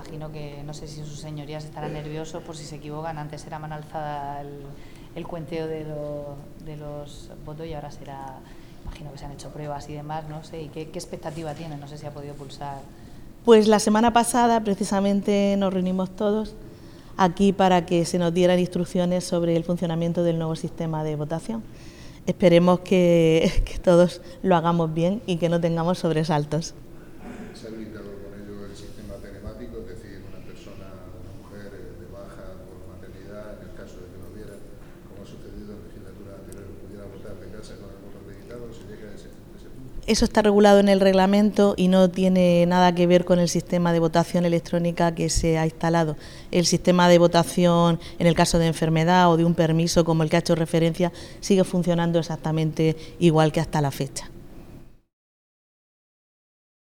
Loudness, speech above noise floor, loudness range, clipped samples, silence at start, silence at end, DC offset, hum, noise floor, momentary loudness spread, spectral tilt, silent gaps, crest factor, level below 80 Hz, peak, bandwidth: -21 LUFS; 23 dB; 22 LU; under 0.1%; 0 s; 2 s; under 0.1%; none; -45 dBFS; 24 LU; -6 dB/octave; none; 20 dB; -42 dBFS; -2 dBFS; 16 kHz